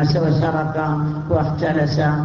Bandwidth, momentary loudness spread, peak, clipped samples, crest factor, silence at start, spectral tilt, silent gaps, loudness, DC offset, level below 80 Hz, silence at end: 6.8 kHz; 4 LU; -4 dBFS; under 0.1%; 14 dB; 0 s; -8 dB/octave; none; -19 LUFS; under 0.1%; -40 dBFS; 0 s